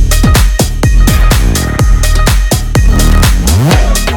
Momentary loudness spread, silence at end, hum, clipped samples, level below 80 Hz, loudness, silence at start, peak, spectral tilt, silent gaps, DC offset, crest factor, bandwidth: 3 LU; 0 s; none; 0.5%; -8 dBFS; -9 LUFS; 0 s; 0 dBFS; -4.5 dB/octave; none; under 0.1%; 6 dB; 18.5 kHz